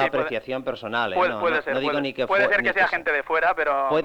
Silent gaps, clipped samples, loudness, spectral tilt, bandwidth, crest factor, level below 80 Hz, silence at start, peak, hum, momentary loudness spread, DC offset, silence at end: none; under 0.1%; -22 LUFS; -5.5 dB/octave; 11 kHz; 16 dB; -56 dBFS; 0 s; -8 dBFS; none; 8 LU; under 0.1%; 0 s